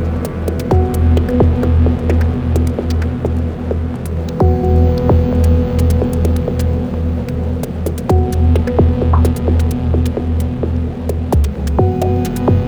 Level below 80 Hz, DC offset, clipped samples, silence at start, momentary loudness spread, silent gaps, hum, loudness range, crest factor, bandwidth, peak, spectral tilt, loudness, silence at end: -18 dBFS; under 0.1%; under 0.1%; 0 s; 7 LU; none; none; 2 LU; 14 dB; 15 kHz; 0 dBFS; -8.5 dB/octave; -15 LUFS; 0 s